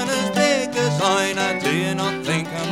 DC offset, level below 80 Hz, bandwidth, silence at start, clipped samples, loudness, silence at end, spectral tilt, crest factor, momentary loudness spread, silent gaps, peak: 0.1%; -66 dBFS; 17 kHz; 0 s; under 0.1%; -20 LUFS; 0 s; -4 dB/octave; 16 dB; 5 LU; none; -4 dBFS